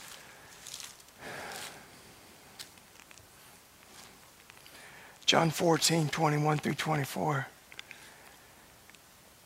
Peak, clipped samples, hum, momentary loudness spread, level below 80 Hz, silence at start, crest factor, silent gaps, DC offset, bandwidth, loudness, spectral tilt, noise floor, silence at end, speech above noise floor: -10 dBFS; under 0.1%; none; 27 LU; -70 dBFS; 0 s; 26 dB; none; under 0.1%; 16 kHz; -30 LUFS; -4 dB/octave; -58 dBFS; 1.3 s; 29 dB